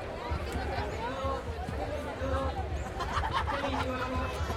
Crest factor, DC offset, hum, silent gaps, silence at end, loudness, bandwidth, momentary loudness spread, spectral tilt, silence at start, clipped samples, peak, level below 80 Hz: 16 dB; under 0.1%; none; none; 0 s; -34 LUFS; 14.5 kHz; 5 LU; -6 dB/octave; 0 s; under 0.1%; -18 dBFS; -40 dBFS